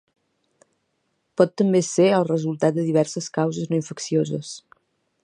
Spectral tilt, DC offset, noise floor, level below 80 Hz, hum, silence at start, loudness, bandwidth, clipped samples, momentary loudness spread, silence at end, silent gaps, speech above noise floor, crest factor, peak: -6 dB/octave; under 0.1%; -72 dBFS; -70 dBFS; none; 1.4 s; -22 LUFS; 10.5 kHz; under 0.1%; 11 LU; 0.65 s; none; 51 dB; 20 dB; -2 dBFS